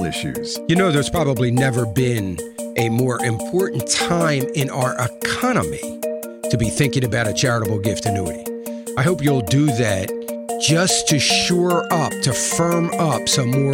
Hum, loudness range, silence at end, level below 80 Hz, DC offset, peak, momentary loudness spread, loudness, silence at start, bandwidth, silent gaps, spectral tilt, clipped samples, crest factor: none; 3 LU; 0 s; -46 dBFS; under 0.1%; -6 dBFS; 10 LU; -19 LUFS; 0 s; 17.5 kHz; none; -4.5 dB/octave; under 0.1%; 14 dB